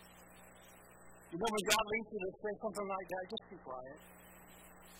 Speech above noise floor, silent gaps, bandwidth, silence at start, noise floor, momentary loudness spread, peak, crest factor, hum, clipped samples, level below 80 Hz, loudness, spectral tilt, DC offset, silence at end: 20 dB; none; 16.5 kHz; 0 s; -60 dBFS; 26 LU; -14 dBFS; 28 dB; 60 Hz at -65 dBFS; under 0.1%; -68 dBFS; -39 LUFS; -2.5 dB/octave; under 0.1%; 0 s